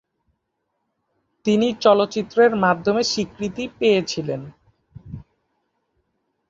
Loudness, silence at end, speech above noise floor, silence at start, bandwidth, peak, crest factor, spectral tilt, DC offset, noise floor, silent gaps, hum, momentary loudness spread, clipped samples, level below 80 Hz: -20 LUFS; 1.3 s; 56 dB; 1.45 s; 7.8 kHz; -2 dBFS; 20 dB; -5 dB/octave; under 0.1%; -75 dBFS; none; none; 18 LU; under 0.1%; -56 dBFS